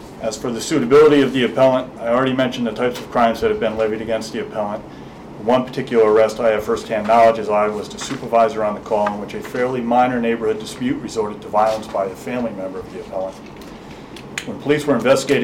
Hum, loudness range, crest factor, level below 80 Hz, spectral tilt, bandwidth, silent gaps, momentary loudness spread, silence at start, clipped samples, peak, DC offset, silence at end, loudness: none; 7 LU; 12 dB; -48 dBFS; -5 dB/octave; 16 kHz; none; 15 LU; 0 s; under 0.1%; -6 dBFS; under 0.1%; 0 s; -18 LUFS